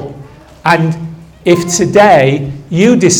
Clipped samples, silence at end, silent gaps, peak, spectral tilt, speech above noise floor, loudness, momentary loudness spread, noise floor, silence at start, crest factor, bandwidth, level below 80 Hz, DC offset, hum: 0.7%; 0 s; none; 0 dBFS; -5 dB/octave; 25 dB; -10 LUFS; 14 LU; -34 dBFS; 0 s; 10 dB; 18 kHz; -42 dBFS; under 0.1%; none